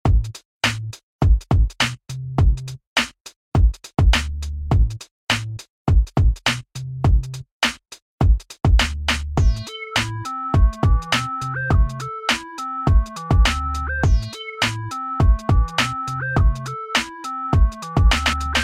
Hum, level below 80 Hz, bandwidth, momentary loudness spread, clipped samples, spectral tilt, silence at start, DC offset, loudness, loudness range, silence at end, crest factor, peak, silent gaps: none; -22 dBFS; 13 kHz; 10 LU; under 0.1%; -4.5 dB/octave; 0.05 s; under 0.1%; -21 LUFS; 1 LU; 0 s; 14 dB; -4 dBFS; 0.45-0.61 s, 1.03-1.19 s, 2.87-2.96 s, 3.36-3.52 s, 5.11-5.27 s, 5.70-5.85 s, 7.52-7.60 s, 8.02-8.18 s